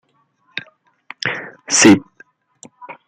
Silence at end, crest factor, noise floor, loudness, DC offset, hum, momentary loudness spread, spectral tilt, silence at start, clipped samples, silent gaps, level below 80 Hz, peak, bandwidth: 0.15 s; 20 dB; -61 dBFS; -14 LUFS; under 0.1%; none; 21 LU; -3 dB/octave; 0.55 s; under 0.1%; none; -60 dBFS; 0 dBFS; 14 kHz